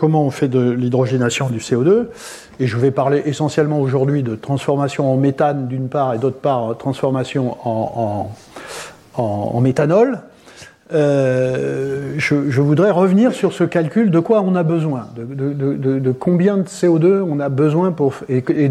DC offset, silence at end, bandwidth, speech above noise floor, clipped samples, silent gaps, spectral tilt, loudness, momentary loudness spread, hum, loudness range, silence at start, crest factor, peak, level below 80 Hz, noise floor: under 0.1%; 0 s; 12.5 kHz; 25 dB; under 0.1%; none; -7.5 dB/octave; -17 LUFS; 9 LU; none; 4 LU; 0 s; 14 dB; -2 dBFS; -58 dBFS; -42 dBFS